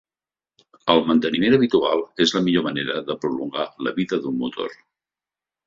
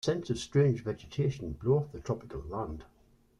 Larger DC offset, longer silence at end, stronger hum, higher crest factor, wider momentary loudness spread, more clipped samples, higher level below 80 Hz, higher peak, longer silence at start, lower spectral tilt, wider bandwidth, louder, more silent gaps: neither; first, 0.95 s vs 0.55 s; neither; about the same, 20 dB vs 18 dB; about the same, 10 LU vs 11 LU; neither; second, -60 dBFS vs -52 dBFS; first, -2 dBFS vs -14 dBFS; first, 0.85 s vs 0.05 s; second, -5.5 dB/octave vs -7 dB/octave; second, 7.6 kHz vs 10.5 kHz; first, -21 LUFS vs -32 LUFS; neither